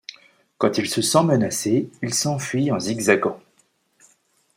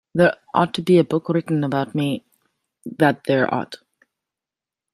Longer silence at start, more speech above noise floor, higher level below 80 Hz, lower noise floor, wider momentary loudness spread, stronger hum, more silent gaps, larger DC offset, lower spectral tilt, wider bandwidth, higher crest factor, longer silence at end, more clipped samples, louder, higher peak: first, 0.6 s vs 0.15 s; second, 43 dB vs 70 dB; about the same, -64 dBFS vs -62 dBFS; second, -64 dBFS vs -89 dBFS; second, 6 LU vs 16 LU; neither; neither; neither; second, -4.5 dB/octave vs -7 dB/octave; first, 16.5 kHz vs 13 kHz; about the same, 20 dB vs 20 dB; about the same, 1.15 s vs 1.2 s; neither; about the same, -21 LUFS vs -20 LUFS; about the same, -2 dBFS vs -2 dBFS